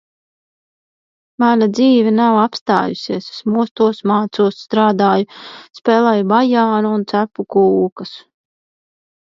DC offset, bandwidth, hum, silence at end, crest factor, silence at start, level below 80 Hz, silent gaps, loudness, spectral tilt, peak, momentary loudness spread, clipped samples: under 0.1%; 7.4 kHz; none; 1.1 s; 16 dB; 1.4 s; -64 dBFS; 2.61-2.66 s, 3.71-3.76 s, 7.92-7.96 s; -15 LUFS; -7 dB/octave; 0 dBFS; 10 LU; under 0.1%